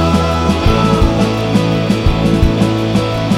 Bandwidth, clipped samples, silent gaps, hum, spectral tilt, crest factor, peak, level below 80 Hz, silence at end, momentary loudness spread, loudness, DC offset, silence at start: 15 kHz; under 0.1%; none; none; -6.5 dB/octave; 12 dB; 0 dBFS; -20 dBFS; 0 s; 2 LU; -13 LUFS; under 0.1%; 0 s